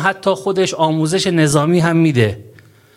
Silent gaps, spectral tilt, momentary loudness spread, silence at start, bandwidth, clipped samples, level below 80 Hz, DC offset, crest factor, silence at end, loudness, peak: none; -5.5 dB/octave; 5 LU; 0 s; 15 kHz; under 0.1%; -50 dBFS; under 0.1%; 16 dB; 0.5 s; -15 LUFS; 0 dBFS